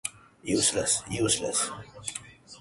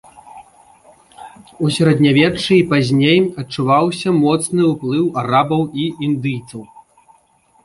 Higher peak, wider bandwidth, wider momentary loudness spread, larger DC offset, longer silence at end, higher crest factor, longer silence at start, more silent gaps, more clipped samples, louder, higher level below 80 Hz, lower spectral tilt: second, -10 dBFS vs -2 dBFS; about the same, 12 kHz vs 12 kHz; first, 14 LU vs 9 LU; neither; second, 0 s vs 1 s; about the same, 20 dB vs 16 dB; second, 0.05 s vs 0.35 s; neither; neither; second, -27 LUFS vs -15 LUFS; about the same, -56 dBFS vs -52 dBFS; second, -2.5 dB/octave vs -6 dB/octave